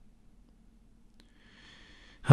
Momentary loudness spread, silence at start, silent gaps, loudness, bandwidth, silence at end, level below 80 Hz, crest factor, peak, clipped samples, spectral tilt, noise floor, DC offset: 11 LU; 2.25 s; none; -51 LUFS; 11.5 kHz; 0 s; -60 dBFS; 26 dB; -4 dBFS; under 0.1%; -8 dB/octave; -59 dBFS; under 0.1%